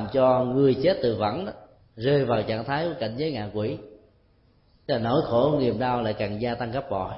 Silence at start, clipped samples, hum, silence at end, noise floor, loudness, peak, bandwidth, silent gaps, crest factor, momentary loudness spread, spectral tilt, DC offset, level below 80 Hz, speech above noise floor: 0 s; under 0.1%; none; 0 s; -61 dBFS; -25 LUFS; -8 dBFS; 5.8 kHz; none; 16 dB; 9 LU; -11 dB/octave; under 0.1%; -52 dBFS; 37 dB